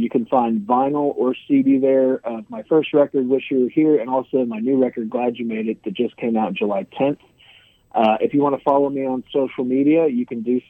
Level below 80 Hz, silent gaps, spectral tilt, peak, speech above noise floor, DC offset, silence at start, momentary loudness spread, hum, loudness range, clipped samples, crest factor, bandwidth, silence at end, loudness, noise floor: -66 dBFS; none; -9.5 dB/octave; -4 dBFS; 33 dB; under 0.1%; 0 s; 8 LU; none; 4 LU; under 0.1%; 16 dB; 3.8 kHz; 0.1 s; -19 LUFS; -51 dBFS